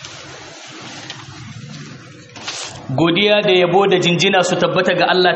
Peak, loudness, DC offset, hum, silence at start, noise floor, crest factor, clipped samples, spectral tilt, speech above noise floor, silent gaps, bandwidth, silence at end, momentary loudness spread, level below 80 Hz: -2 dBFS; -14 LUFS; under 0.1%; none; 0 s; -37 dBFS; 16 dB; under 0.1%; -4.5 dB/octave; 23 dB; none; 8.4 kHz; 0 s; 21 LU; -56 dBFS